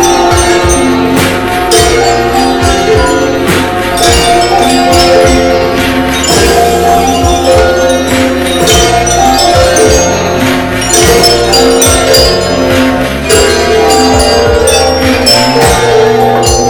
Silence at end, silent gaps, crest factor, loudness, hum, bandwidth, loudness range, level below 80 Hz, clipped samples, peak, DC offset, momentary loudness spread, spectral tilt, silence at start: 0 s; none; 6 dB; -6 LUFS; none; over 20 kHz; 2 LU; -20 dBFS; 4%; 0 dBFS; under 0.1%; 4 LU; -3.5 dB/octave; 0 s